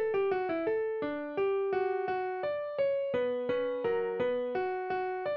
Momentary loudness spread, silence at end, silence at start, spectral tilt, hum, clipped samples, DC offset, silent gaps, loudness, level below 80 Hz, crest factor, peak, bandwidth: 4 LU; 0 s; 0 s; -3.5 dB/octave; none; under 0.1%; under 0.1%; none; -32 LUFS; -70 dBFS; 12 dB; -20 dBFS; 5.8 kHz